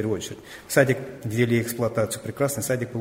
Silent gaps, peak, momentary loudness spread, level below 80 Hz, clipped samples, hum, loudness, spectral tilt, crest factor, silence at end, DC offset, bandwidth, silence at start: none; -4 dBFS; 9 LU; -58 dBFS; under 0.1%; none; -24 LUFS; -5 dB/octave; 20 dB; 0 s; under 0.1%; 16 kHz; 0 s